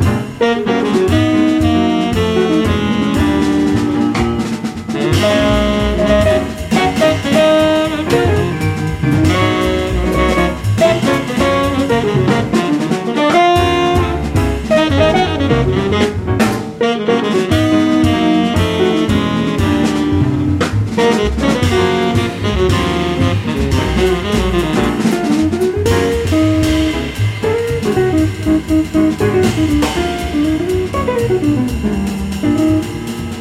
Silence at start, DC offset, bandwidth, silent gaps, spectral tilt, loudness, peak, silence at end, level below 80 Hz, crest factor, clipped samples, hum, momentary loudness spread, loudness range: 0 s; under 0.1%; 16 kHz; none; -6 dB/octave; -14 LUFS; 0 dBFS; 0 s; -28 dBFS; 12 dB; under 0.1%; none; 5 LU; 2 LU